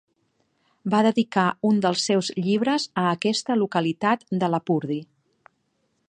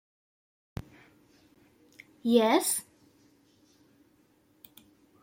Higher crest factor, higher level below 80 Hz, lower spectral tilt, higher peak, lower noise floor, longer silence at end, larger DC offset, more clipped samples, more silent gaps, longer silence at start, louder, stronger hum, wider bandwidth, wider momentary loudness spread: second, 18 dB vs 24 dB; second, -72 dBFS vs -64 dBFS; first, -5 dB/octave vs -3.5 dB/octave; first, -6 dBFS vs -10 dBFS; first, -71 dBFS vs -66 dBFS; second, 1.05 s vs 2.4 s; neither; neither; neither; second, 0.85 s vs 2.25 s; first, -23 LUFS vs -26 LUFS; neither; second, 10 kHz vs 16.5 kHz; second, 4 LU vs 22 LU